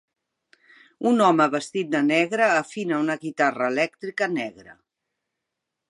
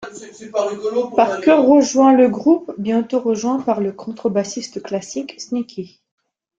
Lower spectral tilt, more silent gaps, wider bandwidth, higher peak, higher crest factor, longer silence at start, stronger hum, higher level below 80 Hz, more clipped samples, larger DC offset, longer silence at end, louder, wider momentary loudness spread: about the same, -5 dB/octave vs -5 dB/octave; neither; first, 11.5 kHz vs 7.8 kHz; second, -6 dBFS vs -2 dBFS; about the same, 20 dB vs 16 dB; first, 1 s vs 0 s; neither; second, -76 dBFS vs -62 dBFS; neither; neither; first, 1.15 s vs 0.7 s; second, -22 LUFS vs -17 LUFS; second, 9 LU vs 16 LU